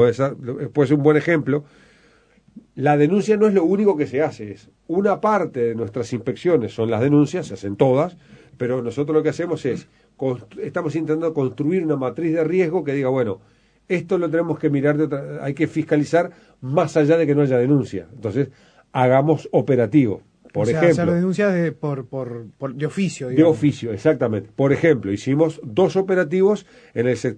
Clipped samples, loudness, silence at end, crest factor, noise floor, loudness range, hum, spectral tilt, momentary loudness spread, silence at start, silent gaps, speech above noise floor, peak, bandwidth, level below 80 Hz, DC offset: under 0.1%; -20 LUFS; 0 s; 18 dB; -55 dBFS; 4 LU; none; -7.5 dB/octave; 11 LU; 0 s; none; 36 dB; -2 dBFS; 9.8 kHz; -60 dBFS; under 0.1%